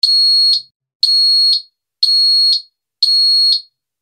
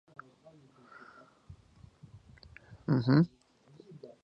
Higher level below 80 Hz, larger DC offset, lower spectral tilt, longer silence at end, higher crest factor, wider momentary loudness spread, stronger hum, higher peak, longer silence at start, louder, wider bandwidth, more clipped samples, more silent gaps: second, -88 dBFS vs -64 dBFS; neither; second, 7 dB/octave vs -9.5 dB/octave; first, 0.4 s vs 0.15 s; second, 14 dB vs 22 dB; second, 8 LU vs 28 LU; neither; first, 0 dBFS vs -12 dBFS; second, 0.05 s vs 1.5 s; first, -10 LUFS vs -29 LUFS; first, 13.5 kHz vs 6 kHz; neither; first, 0.75-0.80 s, 0.95-1.00 s vs none